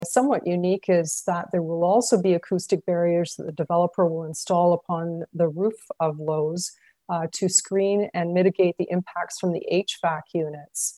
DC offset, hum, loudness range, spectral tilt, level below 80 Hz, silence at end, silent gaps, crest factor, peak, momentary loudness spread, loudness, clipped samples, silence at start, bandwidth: under 0.1%; none; 2 LU; -5 dB/octave; -72 dBFS; 0.05 s; none; 18 dB; -6 dBFS; 8 LU; -24 LUFS; under 0.1%; 0 s; 13 kHz